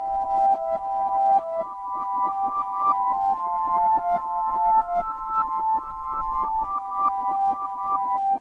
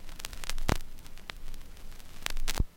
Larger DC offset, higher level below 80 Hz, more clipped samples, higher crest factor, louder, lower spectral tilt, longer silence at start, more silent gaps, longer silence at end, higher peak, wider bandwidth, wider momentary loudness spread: neither; second, -52 dBFS vs -34 dBFS; neither; second, 14 dB vs 28 dB; first, -24 LUFS vs -37 LUFS; first, -6.5 dB/octave vs -3.5 dB/octave; about the same, 0 s vs 0 s; neither; about the same, 0 s vs 0.05 s; second, -10 dBFS vs -4 dBFS; second, 5.2 kHz vs 17 kHz; second, 6 LU vs 16 LU